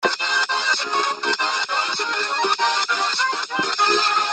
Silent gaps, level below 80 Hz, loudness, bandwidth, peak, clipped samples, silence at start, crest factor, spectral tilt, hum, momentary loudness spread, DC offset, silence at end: none; -74 dBFS; -19 LUFS; 9.4 kHz; -4 dBFS; under 0.1%; 0 s; 16 dB; 0 dB/octave; none; 4 LU; under 0.1%; 0 s